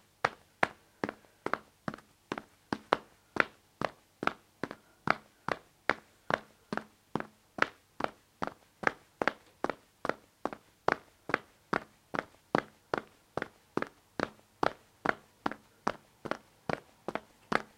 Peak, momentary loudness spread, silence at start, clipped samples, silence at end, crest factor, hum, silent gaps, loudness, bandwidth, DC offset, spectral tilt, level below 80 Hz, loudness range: -4 dBFS; 9 LU; 0.25 s; under 0.1%; 0.15 s; 34 dB; none; none; -37 LUFS; 16.5 kHz; under 0.1%; -5 dB/octave; -68 dBFS; 2 LU